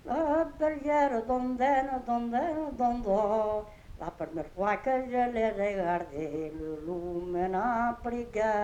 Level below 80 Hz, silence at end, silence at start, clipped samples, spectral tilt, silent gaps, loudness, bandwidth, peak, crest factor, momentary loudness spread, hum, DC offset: -50 dBFS; 0 s; 0.05 s; under 0.1%; -7 dB/octave; none; -30 LUFS; 10.5 kHz; -14 dBFS; 16 dB; 10 LU; none; under 0.1%